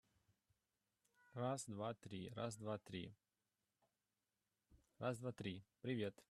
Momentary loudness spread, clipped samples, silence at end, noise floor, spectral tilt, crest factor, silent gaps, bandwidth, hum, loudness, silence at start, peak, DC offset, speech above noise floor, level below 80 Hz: 7 LU; under 0.1%; 0.1 s; under -90 dBFS; -5.5 dB/octave; 20 dB; none; 13 kHz; none; -49 LUFS; 1.35 s; -30 dBFS; under 0.1%; over 42 dB; -82 dBFS